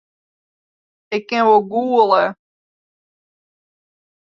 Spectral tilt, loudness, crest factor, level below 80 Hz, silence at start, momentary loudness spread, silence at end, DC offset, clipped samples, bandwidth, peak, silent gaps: -5.5 dB/octave; -16 LUFS; 18 dB; -70 dBFS; 1.1 s; 11 LU; 2 s; under 0.1%; under 0.1%; 7.2 kHz; -2 dBFS; none